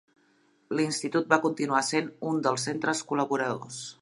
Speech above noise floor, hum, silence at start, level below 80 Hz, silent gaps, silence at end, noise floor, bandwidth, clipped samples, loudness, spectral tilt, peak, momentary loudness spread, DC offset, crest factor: 38 dB; none; 0.7 s; -76 dBFS; none; 0.1 s; -66 dBFS; 11.5 kHz; under 0.1%; -28 LUFS; -4 dB/octave; -4 dBFS; 7 LU; under 0.1%; 24 dB